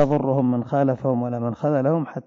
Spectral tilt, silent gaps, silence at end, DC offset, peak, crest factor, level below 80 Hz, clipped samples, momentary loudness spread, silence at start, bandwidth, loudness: -10 dB/octave; none; 0.05 s; under 0.1%; -8 dBFS; 14 dB; -58 dBFS; under 0.1%; 4 LU; 0 s; 7 kHz; -22 LUFS